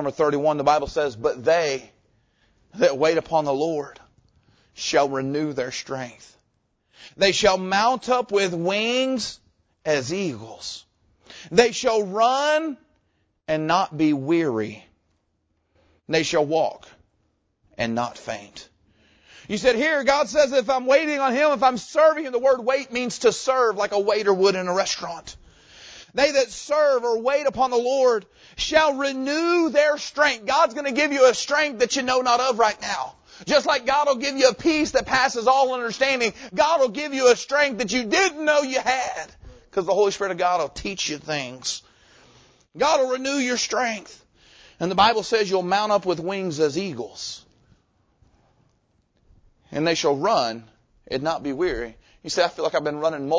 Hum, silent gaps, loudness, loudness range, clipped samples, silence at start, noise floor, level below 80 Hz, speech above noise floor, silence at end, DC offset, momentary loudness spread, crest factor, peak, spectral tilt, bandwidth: none; none; -22 LUFS; 7 LU; under 0.1%; 0 s; -71 dBFS; -56 dBFS; 49 dB; 0 s; under 0.1%; 12 LU; 22 dB; -2 dBFS; -3.5 dB/octave; 8 kHz